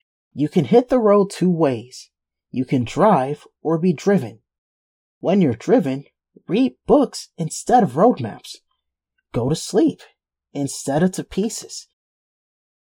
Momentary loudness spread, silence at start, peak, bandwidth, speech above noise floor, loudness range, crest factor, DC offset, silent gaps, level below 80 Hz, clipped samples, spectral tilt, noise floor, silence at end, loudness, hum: 15 LU; 0.35 s; -2 dBFS; 16.5 kHz; 57 dB; 5 LU; 18 dB; under 0.1%; 4.58-5.21 s; -52 dBFS; under 0.1%; -6.5 dB/octave; -75 dBFS; 1.1 s; -19 LUFS; none